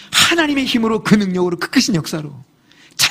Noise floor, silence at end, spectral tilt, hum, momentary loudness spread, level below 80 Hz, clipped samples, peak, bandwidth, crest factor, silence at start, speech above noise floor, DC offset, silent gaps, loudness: -36 dBFS; 0 s; -3.5 dB/octave; none; 14 LU; -50 dBFS; under 0.1%; 0 dBFS; 15.5 kHz; 16 dB; 0 s; 20 dB; under 0.1%; none; -15 LUFS